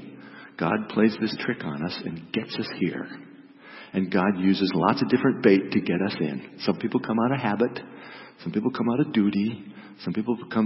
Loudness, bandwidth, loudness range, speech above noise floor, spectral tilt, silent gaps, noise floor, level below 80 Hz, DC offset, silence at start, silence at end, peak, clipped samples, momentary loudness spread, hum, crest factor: -25 LUFS; 5.8 kHz; 5 LU; 22 dB; -10 dB/octave; none; -46 dBFS; -66 dBFS; under 0.1%; 0 s; 0 s; -6 dBFS; under 0.1%; 18 LU; none; 20 dB